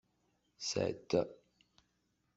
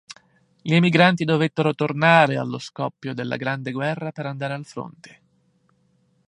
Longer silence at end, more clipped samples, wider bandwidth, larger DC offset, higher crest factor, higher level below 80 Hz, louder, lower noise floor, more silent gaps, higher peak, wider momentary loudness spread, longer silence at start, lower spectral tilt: second, 1 s vs 1.25 s; neither; second, 8 kHz vs 10 kHz; neither; about the same, 22 dB vs 22 dB; second, -74 dBFS vs -66 dBFS; second, -37 LUFS vs -21 LUFS; first, -80 dBFS vs -64 dBFS; neither; second, -18 dBFS vs -2 dBFS; second, 8 LU vs 15 LU; first, 0.6 s vs 0.1 s; second, -4.5 dB/octave vs -6.5 dB/octave